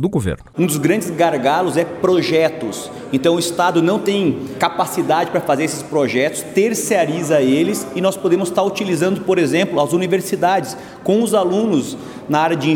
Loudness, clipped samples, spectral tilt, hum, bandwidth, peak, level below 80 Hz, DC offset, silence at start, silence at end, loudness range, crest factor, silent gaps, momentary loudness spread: -17 LUFS; under 0.1%; -5 dB/octave; none; 17.5 kHz; 0 dBFS; -50 dBFS; under 0.1%; 0 s; 0 s; 1 LU; 16 dB; none; 5 LU